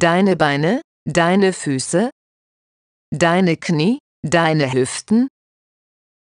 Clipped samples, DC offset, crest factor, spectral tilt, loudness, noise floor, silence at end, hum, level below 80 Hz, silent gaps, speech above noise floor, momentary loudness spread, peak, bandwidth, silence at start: under 0.1%; under 0.1%; 16 dB; -5.5 dB/octave; -17 LUFS; under -90 dBFS; 0.95 s; none; -56 dBFS; 0.84-1.06 s, 2.12-3.12 s, 4.00-4.23 s; over 74 dB; 8 LU; -2 dBFS; 11 kHz; 0 s